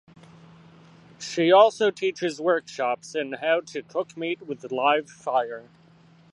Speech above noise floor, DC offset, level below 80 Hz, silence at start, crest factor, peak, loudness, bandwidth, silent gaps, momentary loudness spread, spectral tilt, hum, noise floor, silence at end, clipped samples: 31 dB; under 0.1%; -74 dBFS; 1.2 s; 22 dB; -4 dBFS; -24 LUFS; 11 kHz; none; 15 LU; -4 dB/octave; none; -55 dBFS; 0.7 s; under 0.1%